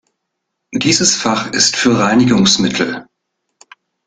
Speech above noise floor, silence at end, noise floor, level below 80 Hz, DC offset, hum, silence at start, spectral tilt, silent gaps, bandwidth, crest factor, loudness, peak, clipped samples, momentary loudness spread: 61 dB; 1.05 s; -74 dBFS; -50 dBFS; under 0.1%; none; 0.7 s; -3 dB/octave; none; 9.6 kHz; 16 dB; -12 LUFS; 0 dBFS; under 0.1%; 9 LU